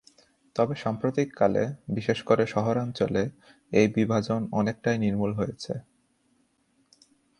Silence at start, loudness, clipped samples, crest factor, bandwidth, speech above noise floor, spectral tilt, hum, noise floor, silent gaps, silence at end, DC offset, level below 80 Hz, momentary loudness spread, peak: 0.55 s; -27 LUFS; under 0.1%; 22 dB; 11 kHz; 43 dB; -7 dB/octave; none; -69 dBFS; none; 1.6 s; under 0.1%; -58 dBFS; 8 LU; -6 dBFS